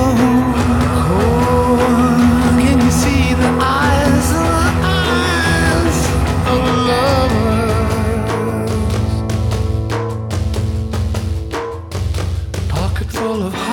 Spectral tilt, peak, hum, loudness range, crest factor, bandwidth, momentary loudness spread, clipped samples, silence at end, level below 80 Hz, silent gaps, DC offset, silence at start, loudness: -6 dB/octave; -2 dBFS; none; 7 LU; 12 dB; 17.5 kHz; 8 LU; under 0.1%; 0 s; -24 dBFS; none; under 0.1%; 0 s; -15 LUFS